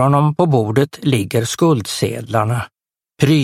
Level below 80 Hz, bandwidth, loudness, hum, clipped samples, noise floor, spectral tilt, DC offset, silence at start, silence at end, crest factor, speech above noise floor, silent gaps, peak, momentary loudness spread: -50 dBFS; 16 kHz; -17 LUFS; none; under 0.1%; -38 dBFS; -6 dB/octave; under 0.1%; 0 s; 0 s; 16 dB; 22 dB; none; 0 dBFS; 6 LU